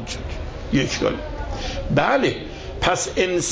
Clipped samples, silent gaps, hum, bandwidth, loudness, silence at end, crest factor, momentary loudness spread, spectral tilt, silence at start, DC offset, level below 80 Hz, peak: under 0.1%; none; none; 8 kHz; -22 LUFS; 0 s; 18 dB; 12 LU; -4 dB/octave; 0 s; under 0.1%; -34 dBFS; -4 dBFS